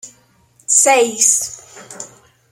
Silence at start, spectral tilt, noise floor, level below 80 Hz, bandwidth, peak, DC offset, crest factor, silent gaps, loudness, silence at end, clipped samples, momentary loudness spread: 0.05 s; 0.5 dB/octave; -54 dBFS; -66 dBFS; 16.5 kHz; 0 dBFS; under 0.1%; 18 dB; none; -12 LUFS; 0.45 s; under 0.1%; 23 LU